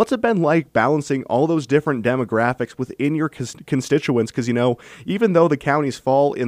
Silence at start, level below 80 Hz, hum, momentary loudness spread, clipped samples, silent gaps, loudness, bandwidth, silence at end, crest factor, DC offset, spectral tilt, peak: 0 s; -58 dBFS; none; 7 LU; under 0.1%; none; -20 LUFS; 15.5 kHz; 0 s; 16 dB; under 0.1%; -6.5 dB/octave; -2 dBFS